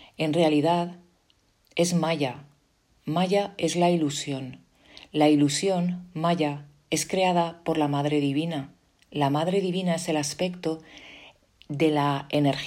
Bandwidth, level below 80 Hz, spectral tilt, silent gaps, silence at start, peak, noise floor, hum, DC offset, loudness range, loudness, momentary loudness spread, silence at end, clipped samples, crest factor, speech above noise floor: 16 kHz; -66 dBFS; -5.5 dB/octave; none; 0 s; -8 dBFS; -66 dBFS; none; under 0.1%; 3 LU; -25 LUFS; 14 LU; 0 s; under 0.1%; 18 dB; 41 dB